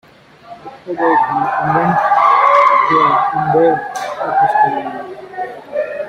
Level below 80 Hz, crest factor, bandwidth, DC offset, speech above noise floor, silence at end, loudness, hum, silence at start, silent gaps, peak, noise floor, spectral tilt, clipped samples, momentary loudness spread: -56 dBFS; 14 dB; 12.5 kHz; under 0.1%; 25 dB; 0 s; -13 LUFS; none; 0.45 s; none; 0 dBFS; -39 dBFS; -6 dB/octave; under 0.1%; 17 LU